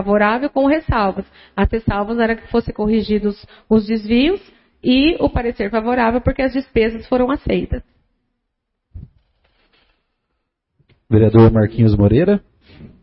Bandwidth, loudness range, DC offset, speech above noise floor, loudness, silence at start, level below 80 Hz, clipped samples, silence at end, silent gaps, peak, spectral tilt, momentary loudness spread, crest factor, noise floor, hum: 5.8 kHz; 8 LU; under 0.1%; 59 dB; -16 LUFS; 0 s; -32 dBFS; under 0.1%; 0.15 s; none; 0 dBFS; -12.5 dB/octave; 8 LU; 16 dB; -75 dBFS; none